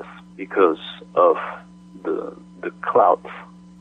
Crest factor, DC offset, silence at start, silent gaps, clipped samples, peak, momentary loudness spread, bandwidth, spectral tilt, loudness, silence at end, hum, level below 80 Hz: 18 dB; under 0.1%; 0 s; none; under 0.1%; -4 dBFS; 20 LU; 5.2 kHz; -7 dB/octave; -20 LUFS; 0.35 s; 60 Hz at -45 dBFS; -64 dBFS